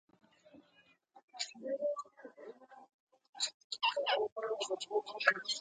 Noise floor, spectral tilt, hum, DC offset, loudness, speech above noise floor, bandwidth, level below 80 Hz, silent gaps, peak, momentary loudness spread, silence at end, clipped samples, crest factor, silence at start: -70 dBFS; 0 dB/octave; none; under 0.1%; -36 LUFS; 34 dB; 9.4 kHz; under -90 dBFS; 1.23-1.28 s, 2.94-3.07 s, 3.29-3.33 s, 3.54-3.70 s, 4.32-4.36 s; -10 dBFS; 21 LU; 0 s; under 0.1%; 28 dB; 0.55 s